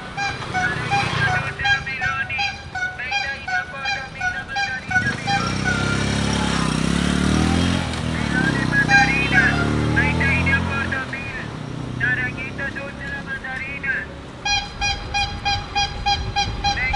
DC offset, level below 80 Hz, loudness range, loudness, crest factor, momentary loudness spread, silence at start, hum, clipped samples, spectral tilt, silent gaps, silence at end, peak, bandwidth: under 0.1%; -36 dBFS; 7 LU; -21 LUFS; 18 dB; 10 LU; 0 s; none; under 0.1%; -4.5 dB/octave; none; 0 s; -4 dBFS; 11.5 kHz